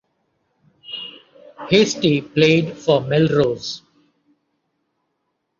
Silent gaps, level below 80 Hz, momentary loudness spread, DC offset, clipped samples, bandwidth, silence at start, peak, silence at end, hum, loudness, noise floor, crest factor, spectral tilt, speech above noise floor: none; -58 dBFS; 18 LU; under 0.1%; under 0.1%; 7.6 kHz; 0.9 s; -2 dBFS; 1.8 s; none; -17 LUFS; -73 dBFS; 20 dB; -5.5 dB/octave; 56 dB